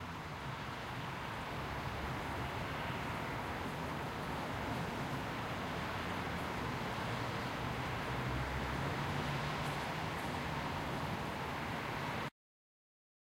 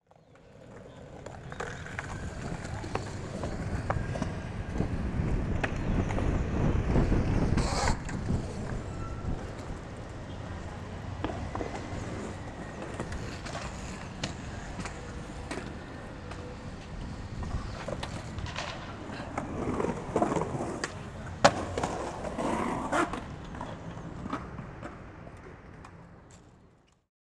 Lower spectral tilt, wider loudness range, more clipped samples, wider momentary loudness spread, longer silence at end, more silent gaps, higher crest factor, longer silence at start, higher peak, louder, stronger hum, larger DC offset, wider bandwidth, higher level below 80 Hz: about the same, -5.5 dB/octave vs -5.5 dB/octave; second, 2 LU vs 10 LU; neither; second, 4 LU vs 14 LU; first, 1 s vs 0.65 s; neither; second, 14 dB vs 30 dB; second, 0 s vs 0.3 s; second, -26 dBFS vs -4 dBFS; second, -40 LUFS vs -34 LUFS; neither; neither; first, 16 kHz vs 12 kHz; second, -54 dBFS vs -40 dBFS